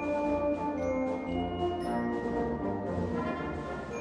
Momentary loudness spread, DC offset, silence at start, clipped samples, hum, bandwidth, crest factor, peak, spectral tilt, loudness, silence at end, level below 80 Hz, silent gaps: 4 LU; under 0.1%; 0 s; under 0.1%; none; 10.5 kHz; 12 dB; -20 dBFS; -7.5 dB/octave; -33 LUFS; 0 s; -50 dBFS; none